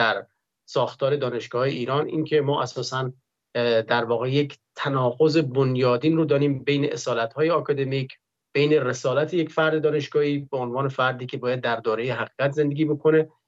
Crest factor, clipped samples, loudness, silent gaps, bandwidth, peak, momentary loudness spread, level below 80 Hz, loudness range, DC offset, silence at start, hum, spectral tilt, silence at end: 16 dB; under 0.1%; -24 LUFS; none; 7.8 kHz; -8 dBFS; 7 LU; -72 dBFS; 3 LU; under 0.1%; 0 s; none; -6.5 dB/octave; 0.2 s